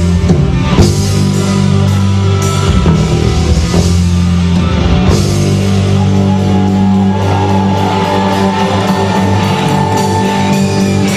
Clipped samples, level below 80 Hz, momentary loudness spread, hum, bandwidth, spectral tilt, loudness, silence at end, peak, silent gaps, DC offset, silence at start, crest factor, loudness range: 0.1%; -22 dBFS; 2 LU; none; 14 kHz; -6 dB/octave; -10 LUFS; 0 s; 0 dBFS; none; under 0.1%; 0 s; 10 dB; 1 LU